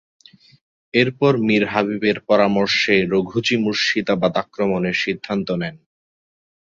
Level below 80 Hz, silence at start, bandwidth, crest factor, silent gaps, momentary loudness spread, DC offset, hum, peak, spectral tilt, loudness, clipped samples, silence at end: -56 dBFS; 0.95 s; 7.6 kHz; 18 dB; none; 6 LU; under 0.1%; none; -2 dBFS; -5.5 dB/octave; -19 LUFS; under 0.1%; 1 s